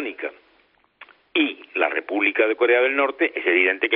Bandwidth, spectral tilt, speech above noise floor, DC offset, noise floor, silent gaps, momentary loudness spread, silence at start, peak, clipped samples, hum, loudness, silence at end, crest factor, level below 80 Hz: 4.5 kHz; 2 dB/octave; 40 dB; under 0.1%; -61 dBFS; none; 9 LU; 0 s; -2 dBFS; under 0.1%; none; -20 LUFS; 0 s; 20 dB; -76 dBFS